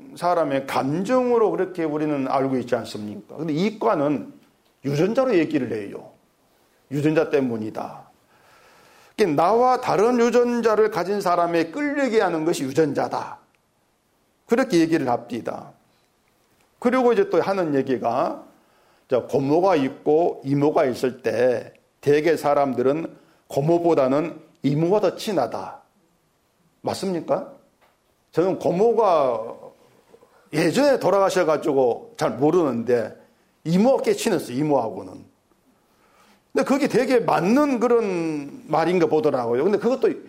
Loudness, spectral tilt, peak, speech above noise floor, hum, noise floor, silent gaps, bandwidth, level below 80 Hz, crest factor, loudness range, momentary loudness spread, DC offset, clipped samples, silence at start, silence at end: -21 LUFS; -6.5 dB/octave; -8 dBFS; 45 dB; none; -66 dBFS; none; 16 kHz; -64 dBFS; 14 dB; 5 LU; 12 LU; under 0.1%; under 0.1%; 0 s; 0 s